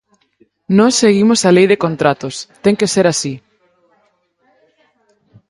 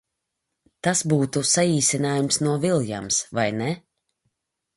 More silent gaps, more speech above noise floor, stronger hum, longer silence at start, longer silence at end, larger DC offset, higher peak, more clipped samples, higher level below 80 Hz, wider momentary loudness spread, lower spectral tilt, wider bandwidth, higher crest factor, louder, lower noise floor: neither; second, 47 dB vs 58 dB; neither; second, 0.7 s vs 0.85 s; first, 2.1 s vs 1 s; neither; first, 0 dBFS vs -6 dBFS; neither; about the same, -56 dBFS vs -60 dBFS; first, 12 LU vs 8 LU; about the same, -4.5 dB/octave vs -4 dB/octave; about the same, 11.5 kHz vs 12 kHz; about the same, 16 dB vs 18 dB; first, -13 LUFS vs -22 LUFS; second, -60 dBFS vs -81 dBFS